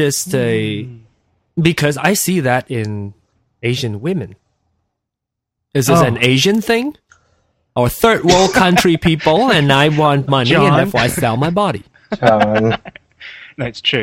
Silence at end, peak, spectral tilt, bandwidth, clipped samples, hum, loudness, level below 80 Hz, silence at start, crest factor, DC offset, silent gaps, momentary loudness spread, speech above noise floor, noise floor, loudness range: 0 s; 0 dBFS; -5 dB/octave; 17 kHz; under 0.1%; none; -14 LUFS; -42 dBFS; 0 s; 16 dB; under 0.1%; none; 15 LU; 67 dB; -80 dBFS; 7 LU